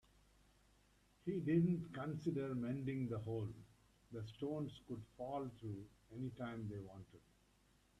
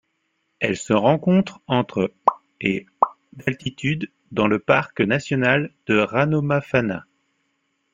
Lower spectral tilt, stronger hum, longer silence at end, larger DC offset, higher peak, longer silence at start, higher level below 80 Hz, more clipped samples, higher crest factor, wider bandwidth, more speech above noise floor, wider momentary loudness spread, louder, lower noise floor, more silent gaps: first, -9 dB/octave vs -6.5 dB/octave; first, 50 Hz at -70 dBFS vs none; second, 0.8 s vs 0.95 s; neither; second, -26 dBFS vs -2 dBFS; first, 1.25 s vs 0.6 s; second, -72 dBFS vs -58 dBFS; neither; about the same, 20 dB vs 20 dB; first, 12 kHz vs 9.4 kHz; second, 31 dB vs 51 dB; first, 16 LU vs 8 LU; second, -44 LUFS vs -21 LUFS; about the same, -74 dBFS vs -72 dBFS; neither